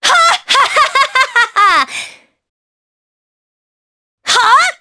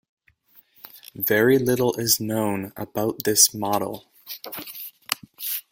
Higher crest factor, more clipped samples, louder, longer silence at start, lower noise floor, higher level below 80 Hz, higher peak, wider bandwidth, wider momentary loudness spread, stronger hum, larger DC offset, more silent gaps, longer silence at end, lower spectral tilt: second, 14 dB vs 22 dB; neither; first, -10 LUFS vs -22 LUFS; second, 0 s vs 0.95 s; second, -32 dBFS vs -57 dBFS; first, -56 dBFS vs -62 dBFS; about the same, 0 dBFS vs -2 dBFS; second, 11 kHz vs 17 kHz; second, 12 LU vs 20 LU; neither; neither; first, 2.49-4.18 s vs none; about the same, 0.05 s vs 0.1 s; second, 1.5 dB/octave vs -3 dB/octave